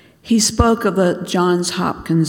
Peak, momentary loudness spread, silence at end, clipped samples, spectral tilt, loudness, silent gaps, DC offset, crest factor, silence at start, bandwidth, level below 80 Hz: 0 dBFS; 5 LU; 0 s; under 0.1%; -4.5 dB/octave; -17 LUFS; none; under 0.1%; 16 dB; 0.25 s; 17.5 kHz; -32 dBFS